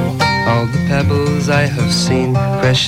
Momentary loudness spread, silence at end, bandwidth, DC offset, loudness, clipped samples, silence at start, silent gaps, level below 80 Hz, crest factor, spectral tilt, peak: 2 LU; 0 s; 15.5 kHz; under 0.1%; -14 LUFS; under 0.1%; 0 s; none; -36 dBFS; 10 dB; -5.5 dB/octave; -4 dBFS